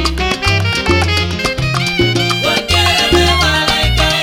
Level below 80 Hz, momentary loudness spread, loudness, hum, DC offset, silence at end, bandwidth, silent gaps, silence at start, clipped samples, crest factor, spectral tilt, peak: -24 dBFS; 5 LU; -12 LUFS; none; under 0.1%; 0 s; 16.5 kHz; none; 0 s; under 0.1%; 12 dB; -4 dB/octave; 0 dBFS